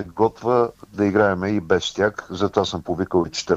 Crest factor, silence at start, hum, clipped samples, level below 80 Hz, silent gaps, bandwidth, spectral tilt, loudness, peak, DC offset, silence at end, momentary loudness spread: 18 dB; 0 s; none; under 0.1%; -50 dBFS; none; 8.2 kHz; -5.5 dB/octave; -21 LUFS; -4 dBFS; under 0.1%; 0 s; 6 LU